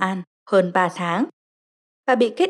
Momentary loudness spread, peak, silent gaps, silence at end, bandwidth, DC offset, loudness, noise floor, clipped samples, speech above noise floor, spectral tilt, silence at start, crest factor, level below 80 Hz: 10 LU; -6 dBFS; 0.27-0.46 s, 1.33-2.03 s; 0 s; 11.5 kHz; under 0.1%; -21 LUFS; under -90 dBFS; under 0.1%; over 70 dB; -6 dB/octave; 0 s; 16 dB; -86 dBFS